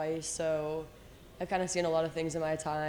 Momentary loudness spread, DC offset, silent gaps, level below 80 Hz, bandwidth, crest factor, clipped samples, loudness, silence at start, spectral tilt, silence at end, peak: 10 LU; under 0.1%; none; -58 dBFS; over 20 kHz; 16 dB; under 0.1%; -33 LUFS; 0 s; -4.5 dB/octave; 0 s; -18 dBFS